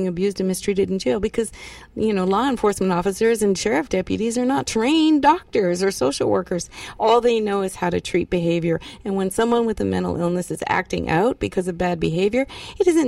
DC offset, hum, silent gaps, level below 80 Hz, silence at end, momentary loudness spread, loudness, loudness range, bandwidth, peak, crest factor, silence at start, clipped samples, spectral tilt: under 0.1%; none; none; -44 dBFS; 0 s; 7 LU; -21 LUFS; 3 LU; 15 kHz; -4 dBFS; 16 dB; 0 s; under 0.1%; -5.5 dB/octave